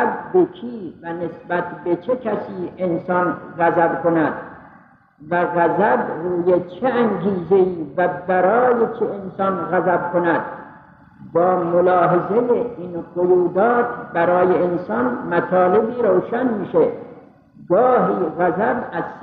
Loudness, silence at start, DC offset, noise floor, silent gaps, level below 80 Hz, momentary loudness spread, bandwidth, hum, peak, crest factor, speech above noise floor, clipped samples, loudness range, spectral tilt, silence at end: -19 LUFS; 0 s; under 0.1%; -49 dBFS; none; -58 dBFS; 9 LU; 4.5 kHz; none; -6 dBFS; 14 dB; 31 dB; under 0.1%; 3 LU; -11 dB/octave; 0 s